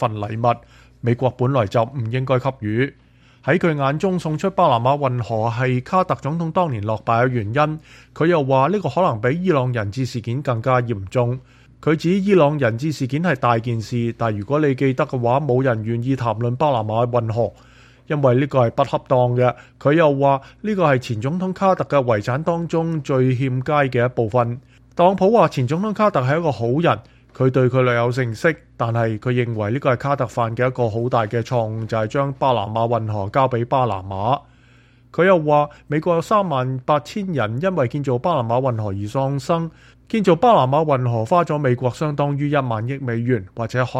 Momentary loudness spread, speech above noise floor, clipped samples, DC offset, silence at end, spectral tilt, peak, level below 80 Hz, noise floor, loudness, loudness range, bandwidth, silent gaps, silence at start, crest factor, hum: 7 LU; 32 dB; under 0.1%; under 0.1%; 0 s; -7.5 dB/octave; -2 dBFS; -52 dBFS; -51 dBFS; -19 LUFS; 2 LU; 9.8 kHz; none; 0 s; 18 dB; none